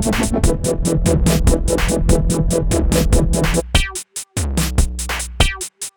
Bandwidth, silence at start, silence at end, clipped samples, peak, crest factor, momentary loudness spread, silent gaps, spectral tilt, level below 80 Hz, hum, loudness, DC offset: over 20 kHz; 0 s; 0.05 s; under 0.1%; 0 dBFS; 16 dB; 7 LU; none; -4.5 dB/octave; -20 dBFS; none; -18 LUFS; 0.4%